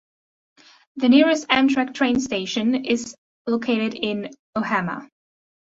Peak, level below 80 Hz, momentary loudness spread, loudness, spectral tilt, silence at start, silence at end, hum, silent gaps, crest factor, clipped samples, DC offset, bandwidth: -2 dBFS; -60 dBFS; 14 LU; -21 LUFS; -4.5 dB/octave; 0.95 s; 0.55 s; none; 3.18-3.45 s, 4.39-4.53 s; 20 dB; under 0.1%; under 0.1%; 8 kHz